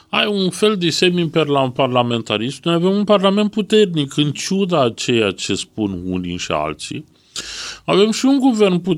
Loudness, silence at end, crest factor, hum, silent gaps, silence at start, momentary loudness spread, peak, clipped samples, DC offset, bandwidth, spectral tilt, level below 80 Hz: -17 LUFS; 0 s; 16 dB; none; none; 0.15 s; 11 LU; 0 dBFS; under 0.1%; under 0.1%; 14.5 kHz; -5 dB/octave; -52 dBFS